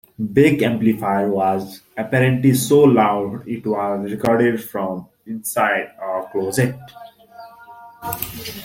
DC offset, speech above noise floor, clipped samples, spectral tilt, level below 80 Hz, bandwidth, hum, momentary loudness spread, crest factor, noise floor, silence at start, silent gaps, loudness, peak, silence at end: under 0.1%; 23 dB; under 0.1%; -6 dB/octave; -56 dBFS; 17 kHz; none; 14 LU; 18 dB; -42 dBFS; 0.2 s; none; -19 LUFS; -2 dBFS; 0 s